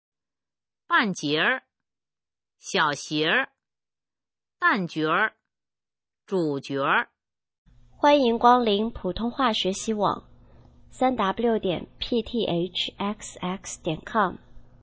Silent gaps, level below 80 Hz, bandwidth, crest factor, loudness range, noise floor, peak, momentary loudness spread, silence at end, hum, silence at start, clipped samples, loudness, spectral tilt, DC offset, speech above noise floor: 7.58-7.65 s; -54 dBFS; 8 kHz; 22 dB; 4 LU; under -90 dBFS; -4 dBFS; 11 LU; 0.2 s; none; 0.9 s; under 0.1%; -25 LUFS; -4 dB/octave; under 0.1%; over 66 dB